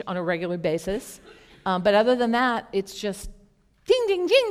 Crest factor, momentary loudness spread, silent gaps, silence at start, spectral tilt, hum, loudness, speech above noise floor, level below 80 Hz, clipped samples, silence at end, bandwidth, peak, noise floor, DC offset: 18 dB; 15 LU; none; 0 s; -5 dB/octave; none; -24 LUFS; 35 dB; -50 dBFS; under 0.1%; 0 s; 16 kHz; -6 dBFS; -58 dBFS; under 0.1%